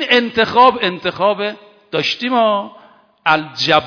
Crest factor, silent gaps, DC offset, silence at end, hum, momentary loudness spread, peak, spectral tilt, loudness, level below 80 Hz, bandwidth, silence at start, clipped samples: 16 dB; none; under 0.1%; 0 s; none; 10 LU; 0 dBFS; -4.5 dB/octave; -15 LUFS; -56 dBFS; 5.4 kHz; 0 s; 0.2%